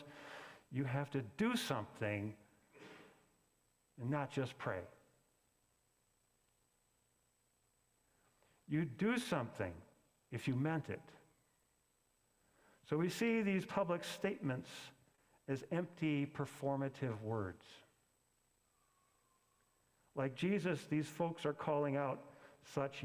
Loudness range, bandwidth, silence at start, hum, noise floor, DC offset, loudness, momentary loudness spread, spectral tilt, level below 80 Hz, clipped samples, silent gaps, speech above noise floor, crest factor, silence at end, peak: 6 LU; 16 kHz; 0 s; none; -79 dBFS; under 0.1%; -41 LUFS; 16 LU; -6.5 dB/octave; -74 dBFS; under 0.1%; none; 39 dB; 22 dB; 0 s; -22 dBFS